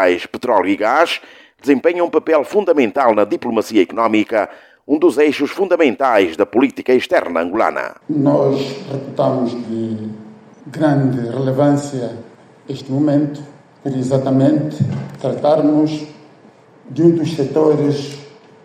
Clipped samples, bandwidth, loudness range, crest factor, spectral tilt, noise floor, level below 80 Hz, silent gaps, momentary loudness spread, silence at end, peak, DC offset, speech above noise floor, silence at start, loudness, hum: under 0.1%; 14.5 kHz; 4 LU; 16 dB; -7 dB/octave; -46 dBFS; -62 dBFS; none; 11 LU; 0.35 s; 0 dBFS; under 0.1%; 30 dB; 0 s; -16 LUFS; none